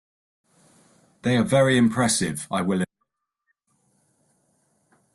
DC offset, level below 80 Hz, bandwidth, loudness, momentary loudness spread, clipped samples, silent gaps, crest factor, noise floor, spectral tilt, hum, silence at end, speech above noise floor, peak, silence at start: under 0.1%; -60 dBFS; 12.5 kHz; -22 LUFS; 9 LU; under 0.1%; none; 18 dB; -77 dBFS; -5 dB/octave; none; 2.3 s; 57 dB; -8 dBFS; 1.25 s